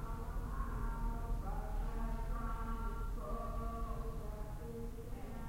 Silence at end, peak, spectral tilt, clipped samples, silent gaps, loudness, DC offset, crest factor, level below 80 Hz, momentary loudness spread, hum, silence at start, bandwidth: 0 s; -28 dBFS; -7 dB/octave; under 0.1%; none; -44 LUFS; under 0.1%; 12 dB; -42 dBFS; 5 LU; none; 0 s; 16 kHz